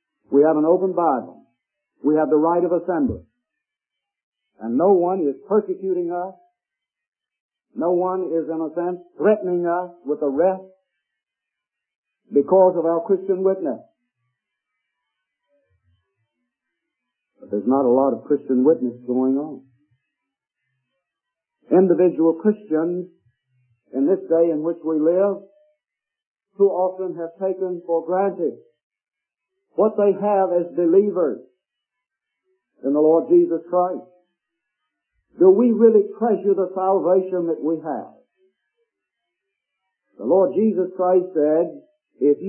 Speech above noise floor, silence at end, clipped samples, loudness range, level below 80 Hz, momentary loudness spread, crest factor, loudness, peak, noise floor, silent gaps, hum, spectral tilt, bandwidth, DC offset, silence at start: 67 dB; 0 s; under 0.1%; 6 LU; -64 dBFS; 11 LU; 20 dB; -20 LUFS; -2 dBFS; -86 dBFS; 4.23-4.32 s, 7.08-7.12 s, 7.40-7.49 s, 11.96-12.03 s, 26.27-26.34 s, 28.83-28.90 s; none; -13.5 dB/octave; 3 kHz; under 0.1%; 0.3 s